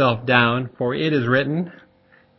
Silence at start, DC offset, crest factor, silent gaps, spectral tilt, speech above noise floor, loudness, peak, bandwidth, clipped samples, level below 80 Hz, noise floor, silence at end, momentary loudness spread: 0 s; under 0.1%; 20 dB; none; -8 dB/octave; 36 dB; -20 LUFS; -2 dBFS; 6 kHz; under 0.1%; -56 dBFS; -56 dBFS; 0.7 s; 9 LU